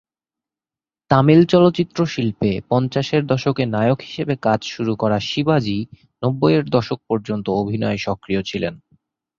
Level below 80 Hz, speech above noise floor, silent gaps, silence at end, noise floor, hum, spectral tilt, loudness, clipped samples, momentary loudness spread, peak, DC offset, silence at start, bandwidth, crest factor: -50 dBFS; over 72 dB; none; 0.6 s; under -90 dBFS; none; -7 dB/octave; -19 LUFS; under 0.1%; 10 LU; -2 dBFS; under 0.1%; 1.1 s; 7.4 kHz; 18 dB